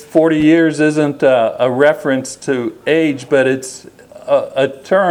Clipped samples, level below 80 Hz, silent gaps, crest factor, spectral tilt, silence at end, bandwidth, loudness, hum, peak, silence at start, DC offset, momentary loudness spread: under 0.1%; -56 dBFS; none; 14 dB; -5.5 dB/octave; 0 s; 13 kHz; -14 LUFS; none; 0 dBFS; 0 s; under 0.1%; 8 LU